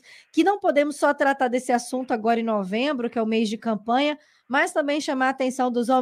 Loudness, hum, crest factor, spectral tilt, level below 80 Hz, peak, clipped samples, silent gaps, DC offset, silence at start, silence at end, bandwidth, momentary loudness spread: -23 LUFS; none; 16 dB; -4 dB/octave; -74 dBFS; -8 dBFS; under 0.1%; none; under 0.1%; 0.1 s; 0 s; 15 kHz; 5 LU